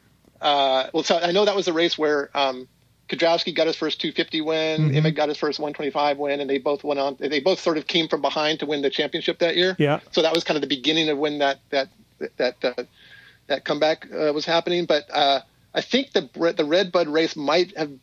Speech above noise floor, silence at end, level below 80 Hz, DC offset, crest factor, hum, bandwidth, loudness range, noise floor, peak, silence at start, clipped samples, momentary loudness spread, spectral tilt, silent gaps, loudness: 27 dB; 0.05 s; -68 dBFS; under 0.1%; 20 dB; none; 9 kHz; 3 LU; -49 dBFS; -2 dBFS; 0.4 s; under 0.1%; 6 LU; -5 dB/octave; none; -22 LUFS